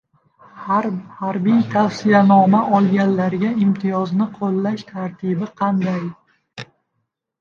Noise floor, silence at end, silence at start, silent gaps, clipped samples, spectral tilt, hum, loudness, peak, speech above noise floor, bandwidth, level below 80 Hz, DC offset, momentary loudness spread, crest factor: -74 dBFS; 0.75 s; 0.55 s; none; under 0.1%; -8 dB/octave; none; -18 LUFS; 0 dBFS; 57 dB; 7 kHz; -64 dBFS; under 0.1%; 13 LU; 18 dB